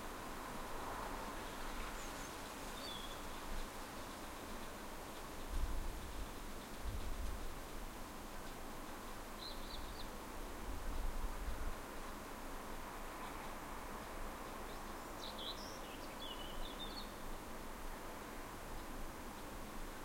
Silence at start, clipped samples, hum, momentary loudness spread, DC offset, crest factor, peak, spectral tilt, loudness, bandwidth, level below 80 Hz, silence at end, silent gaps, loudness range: 0 s; under 0.1%; none; 4 LU; under 0.1%; 18 dB; -28 dBFS; -3.5 dB/octave; -48 LUFS; 16 kHz; -50 dBFS; 0 s; none; 2 LU